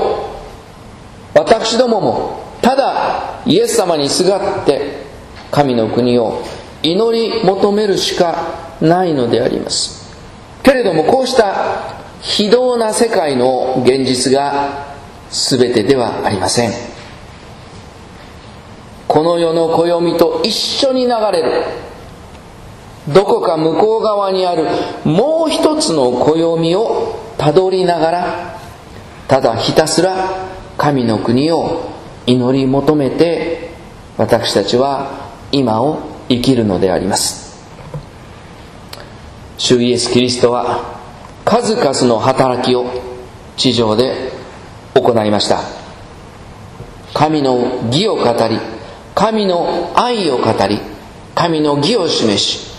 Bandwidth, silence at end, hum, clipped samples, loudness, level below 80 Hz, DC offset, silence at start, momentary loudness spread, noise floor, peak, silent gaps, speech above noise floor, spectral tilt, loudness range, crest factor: 14 kHz; 0 s; none; 0.1%; -14 LUFS; -42 dBFS; under 0.1%; 0 s; 20 LU; -35 dBFS; 0 dBFS; none; 22 dB; -4.5 dB/octave; 3 LU; 14 dB